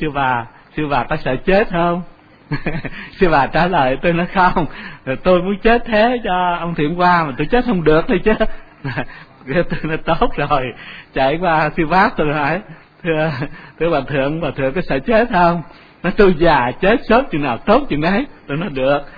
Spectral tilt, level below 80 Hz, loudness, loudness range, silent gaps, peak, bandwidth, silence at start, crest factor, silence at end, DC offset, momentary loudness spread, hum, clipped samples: -9 dB/octave; -30 dBFS; -17 LUFS; 3 LU; none; 0 dBFS; 5 kHz; 0 s; 16 dB; 0 s; under 0.1%; 11 LU; none; under 0.1%